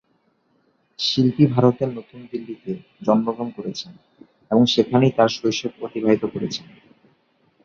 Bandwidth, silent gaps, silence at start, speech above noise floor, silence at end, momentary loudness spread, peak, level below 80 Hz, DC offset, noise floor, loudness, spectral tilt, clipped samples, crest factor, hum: 7.4 kHz; none; 1 s; 45 dB; 1.05 s; 16 LU; -2 dBFS; -60 dBFS; under 0.1%; -65 dBFS; -21 LUFS; -6.5 dB/octave; under 0.1%; 20 dB; none